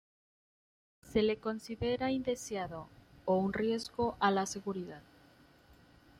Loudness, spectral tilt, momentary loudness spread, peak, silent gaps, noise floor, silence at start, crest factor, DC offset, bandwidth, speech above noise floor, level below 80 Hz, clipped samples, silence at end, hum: -35 LUFS; -5 dB/octave; 12 LU; -14 dBFS; none; -62 dBFS; 1.05 s; 22 dB; under 0.1%; 16 kHz; 29 dB; -62 dBFS; under 0.1%; 0.45 s; none